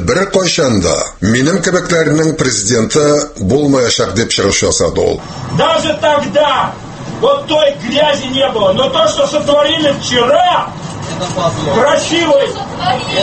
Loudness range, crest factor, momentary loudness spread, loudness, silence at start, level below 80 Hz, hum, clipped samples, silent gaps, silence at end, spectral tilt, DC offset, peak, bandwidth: 1 LU; 12 dB; 5 LU; -12 LUFS; 0 s; -38 dBFS; none; under 0.1%; none; 0 s; -4 dB/octave; under 0.1%; 0 dBFS; 8.8 kHz